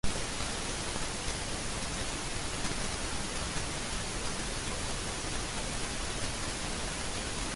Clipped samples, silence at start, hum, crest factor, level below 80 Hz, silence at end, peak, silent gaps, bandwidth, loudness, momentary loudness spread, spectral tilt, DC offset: under 0.1%; 0.05 s; none; 18 dB; -42 dBFS; 0 s; -18 dBFS; none; 11.5 kHz; -35 LUFS; 1 LU; -2.5 dB/octave; under 0.1%